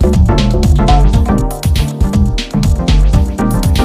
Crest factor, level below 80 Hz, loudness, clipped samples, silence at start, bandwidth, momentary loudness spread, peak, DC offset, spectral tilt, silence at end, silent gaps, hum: 10 dB; -12 dBFS; -12 LUFS; under 0.1%; 0 s; 15.5 kHz; 5 LU; 0 dBFS; under 0.1%; -6.5 dB/octave; 0 s; none; none